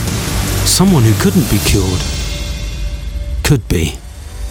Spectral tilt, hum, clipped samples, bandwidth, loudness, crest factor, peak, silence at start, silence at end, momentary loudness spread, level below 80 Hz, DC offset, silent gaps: -4.5 dB/octave; none; under 0.1%; 19 kHz; -14 LUFS; 14 dB; 0 dBFS; 0 s; 0 s; 14 LU; -22 dBFS; under 0.1%; none